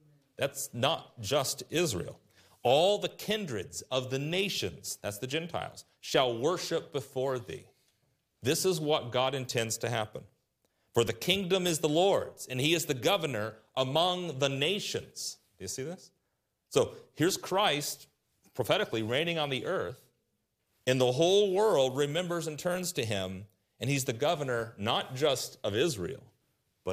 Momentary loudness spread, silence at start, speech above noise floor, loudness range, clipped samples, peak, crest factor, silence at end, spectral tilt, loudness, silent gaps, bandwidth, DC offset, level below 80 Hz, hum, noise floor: 12 LU; 0.4 s; 50 dB; 4 LU; under 0.1%; -8 dBFS; 22 dB; 0 s; -4 dB/octave; -31 LUFS; none; 15.5 kHz; under 0.1%; -70 dBFS; none; -80 dBFS